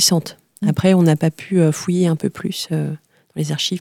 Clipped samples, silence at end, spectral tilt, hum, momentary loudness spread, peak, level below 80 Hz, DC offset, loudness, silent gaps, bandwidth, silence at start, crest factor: under 0.1%; 0 s; -5 dB/octave; none; 13 LU; -2 dBFS; -54 dBFS; under 0.1%; -18 LUFS; none; 16.5 kHz; 0 s; 16 dB